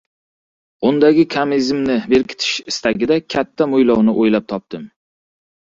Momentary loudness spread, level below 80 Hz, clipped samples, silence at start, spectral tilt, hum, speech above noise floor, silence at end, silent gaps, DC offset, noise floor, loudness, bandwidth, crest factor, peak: 9 LU; -52 dBFS; under 0.1%; 0.8 s; -5 dB/octave; none; over 75 dB; 0.9 s; none; under 0.1%; under -90 dBFS; -16 LUFS; 7.8 kHz; 16 dB; -2 dBFS